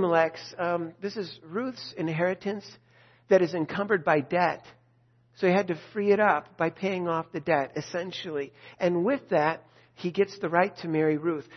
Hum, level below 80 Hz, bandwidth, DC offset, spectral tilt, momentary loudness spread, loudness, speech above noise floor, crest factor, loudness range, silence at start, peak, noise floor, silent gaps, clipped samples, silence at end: none; -72 dBFS; 6.4 kHz; under 0.1%; -6.5 dB/octave; 11 LU; -28 LUFS; 37 dB; 20 dB; 3 LU; 0 s; -6 dBFS; -64 dBFS; none; under 0.1%; 0 s